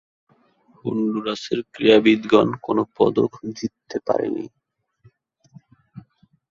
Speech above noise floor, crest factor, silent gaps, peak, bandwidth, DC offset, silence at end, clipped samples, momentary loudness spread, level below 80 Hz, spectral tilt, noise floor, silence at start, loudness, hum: 38 dB; 20 dB; none; -2 dBFS; 7.4 kHz; under 0.1%; 0.5 s; under 0.1%; 15 LU; -60 dBFS; -6 dB/octave; -58 dBFS; 0.85 s; -21 LUFS; none